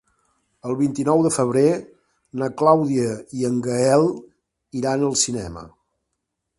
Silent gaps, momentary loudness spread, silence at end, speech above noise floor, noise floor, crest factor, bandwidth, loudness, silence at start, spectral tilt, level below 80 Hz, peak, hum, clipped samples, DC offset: none; 16 LU; 0.9 s; 58 dB; -78 dBFS; 20 dB; 11.5 kHz; -20 LUFS; 0.65 s; -5 dB/octave; -54 dBFS; -2 dBFS; none; under 0.1%; under 0.1%